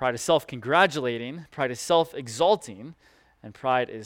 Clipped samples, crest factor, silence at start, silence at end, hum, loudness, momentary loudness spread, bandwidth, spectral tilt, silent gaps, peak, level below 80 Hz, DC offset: under 0.1%; 20 dB; 0 s; 0 s; none; -25 LUFS; 15 LU; 17 kHz; -4 dB/octave; none; -6 dBFS; -64 dBFS; under 0.1%